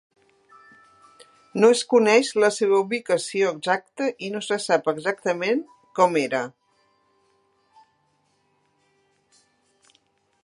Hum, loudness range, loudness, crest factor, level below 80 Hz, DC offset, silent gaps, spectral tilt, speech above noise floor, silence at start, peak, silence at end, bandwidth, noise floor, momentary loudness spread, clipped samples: none; 8 LU; -22 LUFS; 22 dB; -78 dBFS; under 0.1%; none; -4 dB/octave; 46 dB; 1.55 s; -2 dBFS; 3.95 s; 11.5 kHz; -67 dBFS; 11 LU; under 0.1%